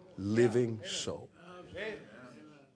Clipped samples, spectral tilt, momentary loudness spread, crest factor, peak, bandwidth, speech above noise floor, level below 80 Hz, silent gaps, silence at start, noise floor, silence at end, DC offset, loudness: under 0.1%; -5 dB/octave; 24 LU; 20 dB; -14 dBFS; 10.5 kHz; 22 dB; -70 dBFS; none; 0 s; -55 dBFS; 0.25 s; under 0.1%; -33 LUFS